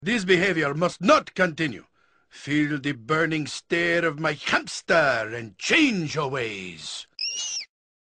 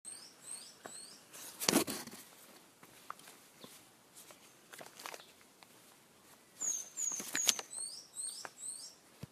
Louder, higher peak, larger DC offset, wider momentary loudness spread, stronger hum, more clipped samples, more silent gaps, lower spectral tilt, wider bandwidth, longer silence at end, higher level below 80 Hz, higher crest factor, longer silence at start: first, -24 LUFS vs -38 LUFS; about the same, -6 dBFS vs -4 dBFS; neither; second, 13 LU vs 26 LU; neither; neither; neither; first, -4 dB/octave vs -1 dB/octave; second, 10 kHz vs 14 kHz; first, 0.45 s vs 0 s; first, -60 dBFS vs -82 dBFS; second, 20 dB vs 40 dB; about the same, 0 s vs 0.05 s